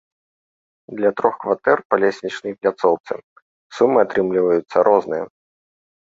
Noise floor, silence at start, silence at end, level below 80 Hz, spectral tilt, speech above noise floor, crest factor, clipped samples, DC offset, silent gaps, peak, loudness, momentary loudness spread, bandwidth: under -90 dBFS; 0.9 s; 0.85 s; -64 dBFS; -6.5 dB/octave; over 72 dB; 20 dB; under 0.1%; under 0.1%; 1.85-1.90 s, 3.00-3.04 s, 3.24-3.36 s, 3.42-3.70 s; 0 dBFS; -19 LUFS; 14 LU; 7.6 kHz